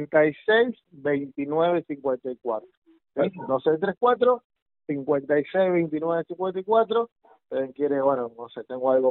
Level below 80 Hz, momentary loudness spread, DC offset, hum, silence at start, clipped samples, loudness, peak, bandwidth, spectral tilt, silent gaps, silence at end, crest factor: -70 dBFS; 11 LU; under 0.1%; none; 0 s; under 0.1%; -25 LUFS; -8 dBFS; 4.2 kHz; -4.5 dB/octave; 2.77-2.82 s, 4.45-4.50 s, 4.62-4.66 s, 7.12-7.16 s; 0 s; 16 dB